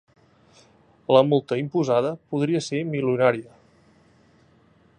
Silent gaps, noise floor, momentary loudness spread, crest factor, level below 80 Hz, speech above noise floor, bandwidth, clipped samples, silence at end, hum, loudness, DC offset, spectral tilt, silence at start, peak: none; -58 dBFS; 9 LU; 22 dB; -68 dBFS; 36 dB; 9.6 kHz; under 0.1%; 1.55 s; none; -22 LUFS; under 0.1%; -6.5 dB/octave; 1.1 s; -2 dBFS